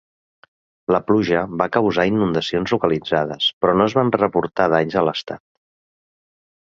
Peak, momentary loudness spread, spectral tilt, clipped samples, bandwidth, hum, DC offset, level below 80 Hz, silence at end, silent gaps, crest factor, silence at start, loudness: -2 dBFS; 5 LU; -6.5 dB/octave; under 0.1%; 7.4 kHz; none; under 0.1%; -52 dBFS; 1.4 s; 3.53-3.61 s; 18 dB; 0.9 s; -19 LUFS